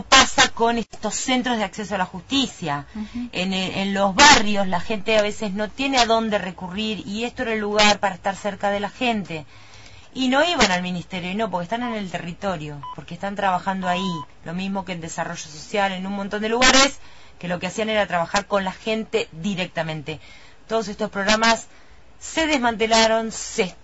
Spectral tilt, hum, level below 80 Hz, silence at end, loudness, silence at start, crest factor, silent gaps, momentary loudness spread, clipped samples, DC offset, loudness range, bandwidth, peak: -3 dB/octave; none; -46 dBFS; 0 s; -21 LUFS; 0 s; 22 dB; none; 13 LU; under 0.1%; under 0.1%; 7 LU; 8 kHz; 0 dBFS